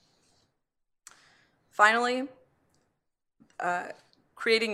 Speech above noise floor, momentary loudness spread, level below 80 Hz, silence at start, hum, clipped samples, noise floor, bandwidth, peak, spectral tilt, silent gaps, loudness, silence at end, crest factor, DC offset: 54 dB; 19 LU; -84 dBFS; 1.8 s; none; under 0.1%; -80 dBFS; 13.5 kHz; -6 dBFS; -2.5 dB/octave; none; -26 LUFS; 0 s; 26 dB; under 0.1%